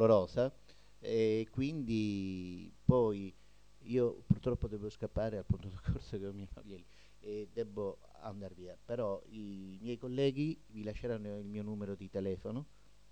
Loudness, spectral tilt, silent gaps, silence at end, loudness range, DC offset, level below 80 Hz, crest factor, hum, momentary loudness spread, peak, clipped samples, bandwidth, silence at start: -38 LUFS; -8.5 dB/octave; none; 0.45 s; 8 LU; 0.1%; -54 dBFS; 24 dB; 50 Hz at -60 dBFS; 16 LU; -14 dBFS; under 0.1%; 9.2 kHz; 0 s